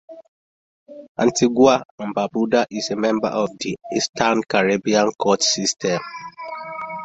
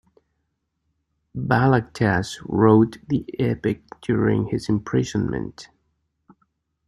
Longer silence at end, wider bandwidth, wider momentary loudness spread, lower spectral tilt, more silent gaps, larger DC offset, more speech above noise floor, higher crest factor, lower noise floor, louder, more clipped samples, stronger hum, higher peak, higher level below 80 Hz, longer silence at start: second, 0 s vs 1.2 s; second, 8.2 kHz vs 12 kHz; first, 15 LU vs 12 LU; second, -3.5 dB/octave vs -7.5 dB/octave; first, 0.28-0.86 s, 1.08-1.15 s, 1.85-1.98 s, 4.09-4.13 s vs none; neither; first, over 70 dB vs 54 dB; about the same, 20 dB vs 20 dB; first, under -90 dBFS vs -75 dBFS; about the same, -20 LUFS vs -22 LUFS; neither; neither; about the same, -2 dBFS vs -2 dBFS; second, -60 dBFS vs -50 dBFS; second, 0.1 s vs 1.35 s